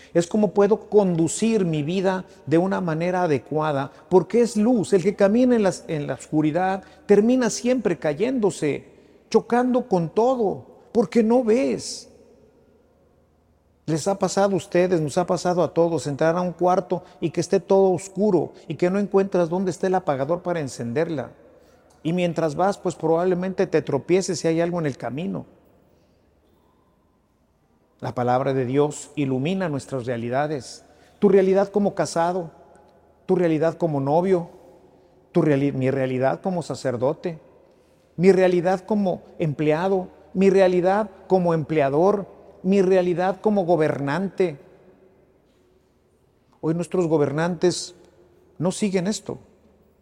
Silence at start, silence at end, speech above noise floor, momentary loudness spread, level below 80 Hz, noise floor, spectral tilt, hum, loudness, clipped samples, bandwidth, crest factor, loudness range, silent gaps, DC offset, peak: 0.15 s; 0.65 s; 42 dB; 10 LU; -60 dBFS; -63 dBFS; -6.5 dB/octave; none; -22 LUFS; under 0.1%; 11.5 kHz; 20 dB; 5 LU; none; under 0.1%; -2 dBFS